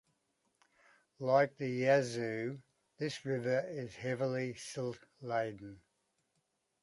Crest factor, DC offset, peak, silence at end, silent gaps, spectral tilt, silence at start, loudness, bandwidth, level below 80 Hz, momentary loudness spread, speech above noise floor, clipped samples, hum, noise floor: 20 dB; under 0.1%; -16 dBFS; 1.05 s; none; -6 dB/octave; 1.2 s; -36 LUFS; 11.5 kHz; -76 dBFS; 13 LU; 46 dB; under 0.1%; none; -81 dBFS